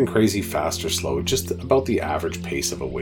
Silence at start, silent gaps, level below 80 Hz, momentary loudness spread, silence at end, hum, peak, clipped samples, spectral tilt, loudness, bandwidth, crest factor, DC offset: 0 s; none; -42 dBFS; 5 LU; 0 s; none; -6 dBFS; under 0.1%; -4.5 dB/octave; -23 LUFS; 19 kHz; 18 dB; under 0.1%